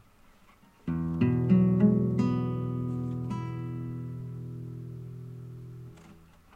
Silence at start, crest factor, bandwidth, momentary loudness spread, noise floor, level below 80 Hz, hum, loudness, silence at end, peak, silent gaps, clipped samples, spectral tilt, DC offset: 0.85 s; 18 dB; 7 kHz; 20 LU; -58 dBFS; -54 dBFS; none; -29 LUFS; 0.4 s; -12 dBFS; none; under 0.1%; -10 dB/octave; under 0.1%